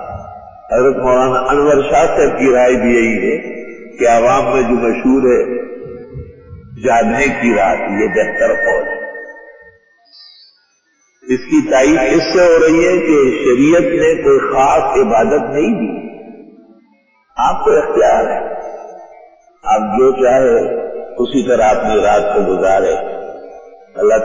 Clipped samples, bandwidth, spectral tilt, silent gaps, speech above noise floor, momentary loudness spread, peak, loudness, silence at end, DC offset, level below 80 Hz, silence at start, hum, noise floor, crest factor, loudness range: under 0.1%; 7.6 kHz; -5.5 dB/octave; none; 46 dB; 17 LU; -2 dBFS; -12 LUFS; 0 s; under 0.1%; -40 dBFS; 0 s; none; -58 dBFS; 12 dB; 6 LU